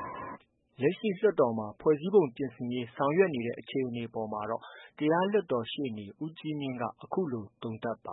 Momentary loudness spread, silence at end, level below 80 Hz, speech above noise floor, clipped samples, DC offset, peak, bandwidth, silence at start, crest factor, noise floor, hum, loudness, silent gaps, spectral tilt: 13 LU; 0 s; -72 dBFS; 20 dB; under 0.1%; under 0.1%; -12 dBFS; 4.1 kHz; 0 s; 20 dB; -50 dBFS; none; -31 LUFS; none; -10.5 dB/octave